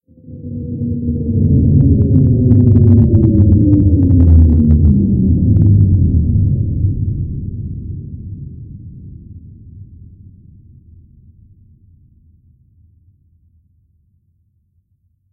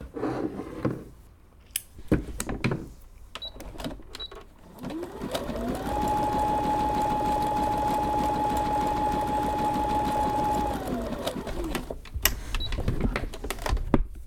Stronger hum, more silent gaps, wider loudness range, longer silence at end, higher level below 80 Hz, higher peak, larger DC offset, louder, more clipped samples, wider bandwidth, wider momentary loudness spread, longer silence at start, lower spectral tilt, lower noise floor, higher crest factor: neither; neither; first, 19 LU vs 8 LU; first, 5.5 s vs 0 s; first, -22 dBFS vs -36 dBFS; about the same, 0 dBFS vs -2 dBFS; neither; first, -12 LUFS vs -29 LUFS; neither; second, 1.2 kHz vs 19 kHz; first, 20 LU vs 12 LU; first, 0.3 s vs 0 s; first, -15.5 dB/octave vs -5 dB/octave; first, -61 dBFS vs -52 dBFS; second, 14 dB vs 26 dB